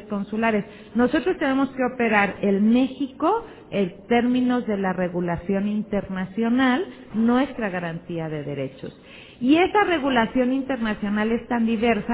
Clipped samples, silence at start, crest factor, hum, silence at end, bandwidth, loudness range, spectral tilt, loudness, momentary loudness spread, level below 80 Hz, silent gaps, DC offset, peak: under 0.1%; 0 s; 18 dB; none; 0 s; 4 kHz; 2 LU; -10 dB/octave; -23 LUFS; 10 LU; -52 dBFS; none; under 0.1%; -4 dBFS